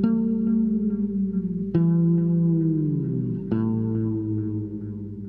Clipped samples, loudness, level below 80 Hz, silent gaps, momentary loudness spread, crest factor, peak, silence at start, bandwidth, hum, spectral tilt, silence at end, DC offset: under 0.1%; -24 LUFS; -50 dBFS; none; 7 LU; 14 dB; -8 dBFS; 0 s; 3 kHz; none; -13.5 dB/octave; 0 s; under 0.1%